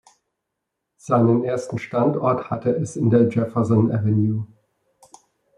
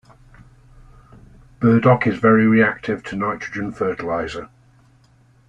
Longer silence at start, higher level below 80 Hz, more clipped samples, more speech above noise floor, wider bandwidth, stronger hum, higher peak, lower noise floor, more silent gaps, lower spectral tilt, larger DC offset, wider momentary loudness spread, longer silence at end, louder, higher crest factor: second, 1.05 s vs 1.6 s; second, -62 dBFS vs -50 dBFS; neither; first, 61 dB vs 36 dB; first, 10.5 kHz vs 7.8 kHz; neither; about the same, -4 dBFS vs -2 dBFS; first, -80 dBFS vs -54 dBFS; neither; about the same, -9 dB/octave vs -8 dB/octave; neither; second, 9 LU vs 12 LU; about the same, 1.1 s vs 1.05 s; about the same, -20 LUFS vs -18 LUFS; about the same, 18 dB vs 18 dB